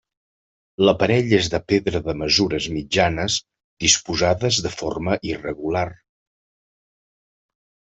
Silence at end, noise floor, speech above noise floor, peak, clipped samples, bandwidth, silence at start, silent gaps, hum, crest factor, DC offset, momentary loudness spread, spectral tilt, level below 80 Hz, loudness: 1.95 s; under -90 dBFS; over 70 dB; -2 dBFS; under 0.1%; 8.2 kHz; 0.8 s; 3.64-3.77 s; none; 20 dB; under 0.1%; 9 LU; -3.5 dB/octave; -46 dBFS; -20 LUFS